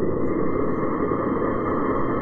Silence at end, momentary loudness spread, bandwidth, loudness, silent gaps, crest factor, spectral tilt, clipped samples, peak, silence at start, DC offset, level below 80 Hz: 0 s; 1 LU; 4.4 kHz; -24 LUFS; none; 10 dB; -11 dB/octave; under 0.1%; -12 dBFS; 0 s; under 0.1%; -40 dBFS